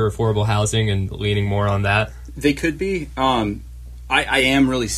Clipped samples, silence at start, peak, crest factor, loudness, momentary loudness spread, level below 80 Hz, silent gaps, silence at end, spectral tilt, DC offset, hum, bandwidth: under 0.1%; 0 s; -2 dBFS; 18 dB; -19 LUFS; 9 LU; -36 dBFS; none; 0 s; -5 dB/octave; under 0.1%; none; 14 kHz